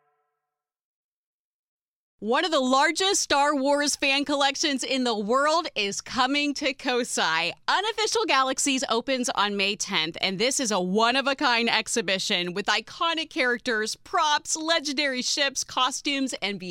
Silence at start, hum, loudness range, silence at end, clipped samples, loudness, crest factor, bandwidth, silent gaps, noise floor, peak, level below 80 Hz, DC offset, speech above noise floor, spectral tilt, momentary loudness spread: 2.2 s; none; 2 LU; 0 s; under 0.1%; -24 LUFS; 20 dB; 16.5 kHz; none; -86 dBFS; -6 dBFS; -66 dBFS; under 0.1%; 61 dB; -2 dB/octave; 5 LU